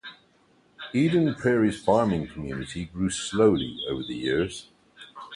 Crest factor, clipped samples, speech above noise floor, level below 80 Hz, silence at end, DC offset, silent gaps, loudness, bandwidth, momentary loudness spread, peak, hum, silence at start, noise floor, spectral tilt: 18 dB; under 0.1%; 37 dB; -50 dBFS; 0 s; under 0.1%; none; -25 LUFS; 11.5 kHz; 17 LU; -8 dBFS; none; 0.05 s; -62 dBFS; -5.5 dB/octave